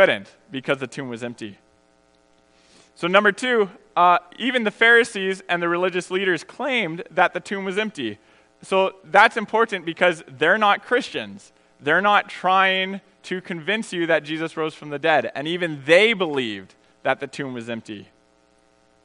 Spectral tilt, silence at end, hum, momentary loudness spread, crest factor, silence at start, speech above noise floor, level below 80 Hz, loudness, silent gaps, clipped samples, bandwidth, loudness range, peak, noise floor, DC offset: -4.5 dB/octave; 1 s; none; 15 LU; 22 dB; 0 s; 38 dB; -72 dBFS; -21 LUFS; none; under 0.1%; 10.5 kHz; 5 LU; 0 dBFS; -59 dBFS; under 0.1%